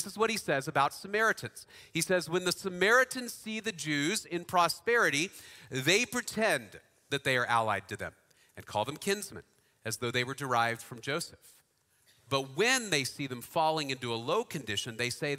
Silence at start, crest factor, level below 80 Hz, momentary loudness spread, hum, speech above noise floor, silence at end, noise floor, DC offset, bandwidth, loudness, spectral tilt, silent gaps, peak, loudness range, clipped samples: 0 s; 22 dB; -70 dBFS; 12 LU; none; 38 dB; 0 s; -70 dBFS; under 0.1%; 16 kHz; -31 LUFS; -3 dB/octave; none; -12 dBFS; 5 LU; under 0.1%